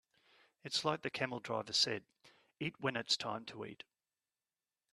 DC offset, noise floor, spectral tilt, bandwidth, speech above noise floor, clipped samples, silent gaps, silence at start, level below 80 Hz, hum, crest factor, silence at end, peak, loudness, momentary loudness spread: under 0.1%; under -90 dBFS; -3 dB/octave; 13.5 kHz; over 51 dB; under 0.1%; none; 0.65 s; -80 dBFS; none; 24 dB; 1.2 s; -18 dBFS; -37 LUFS; 16 LU